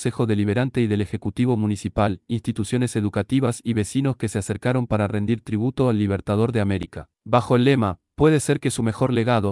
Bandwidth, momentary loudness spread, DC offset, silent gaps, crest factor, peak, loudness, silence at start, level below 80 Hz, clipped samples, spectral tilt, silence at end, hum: 12 kHz; 7 LU; under 0.1%; none; 16 dB; -4 dBFS; -22 LUFS; 0 s; -48 dBFS; under 0.1%; -6.5 dB/octave; 0 s; none